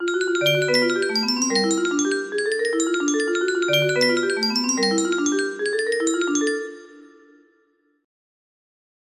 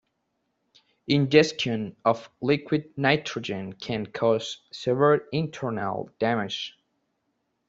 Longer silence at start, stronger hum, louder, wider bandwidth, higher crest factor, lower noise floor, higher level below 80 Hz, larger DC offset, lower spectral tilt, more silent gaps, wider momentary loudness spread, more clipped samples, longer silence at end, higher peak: second, 0 s vs 1.1 s; neither; first, -21 LUFS vs -26 LUFS; first, 15 kHz vs 7.8 kHz; second, 16 dB vs 22 dB; second, -64 dBFS vs -76 dBFS; second, -70 dBFS vs -64 dBFS; neither; second, -3 dB/octave vs -5.5 dB/octave; neither; second, 5 LU vs 12 LU; neither; first, 2.05 s vs 1 s; about the same, -6 dBFS vs -4 dBFS